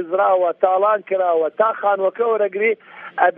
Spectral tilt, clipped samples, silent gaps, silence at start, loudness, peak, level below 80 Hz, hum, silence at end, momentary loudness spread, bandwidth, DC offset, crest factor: -8.5 dB/octave; under 0.1%; none; 0 s; -18 LUFS; -2 dBFS; -82 dBFS; none; 0.05 s; 4 LU; 3.7 kHz; under 0.1%; 16 dB